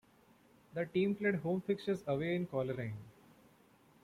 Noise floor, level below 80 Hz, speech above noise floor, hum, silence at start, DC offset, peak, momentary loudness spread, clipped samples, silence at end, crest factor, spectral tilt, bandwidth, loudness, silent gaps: -66 dBFS; -72 dBFS; 31 dB; none; 0.75 s; under 0.1%; -20 dBFS; 10 LU; under 0.1%; 0.95 s; 18 dB; -8 dB/octave; 14.5 kHz; -37 LUFS; none